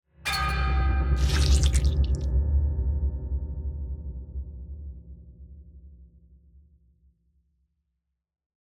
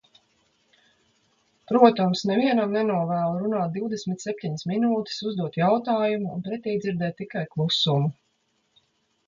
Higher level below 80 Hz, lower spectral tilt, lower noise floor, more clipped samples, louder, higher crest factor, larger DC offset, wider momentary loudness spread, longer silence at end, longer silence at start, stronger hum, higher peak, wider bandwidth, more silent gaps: first, -28 dBFS vs -68 dBFS; second, -5 dB/octave vs -6.5 dB/octave; first, -81 dBFS vs -71 dBFS; neither; second, -27 LUFS vs -24 LUFS; about the same, 18 dB vs 22 dB; neither; first, 23 LU vs 11 LU; first, 2.7 s vs 1.15 s; second, 0.25 s vs 1.7 s; neither; second, -8 dBFS vs -4 dBFS; first, 13.5 kHz vs 7.6 kHz; neither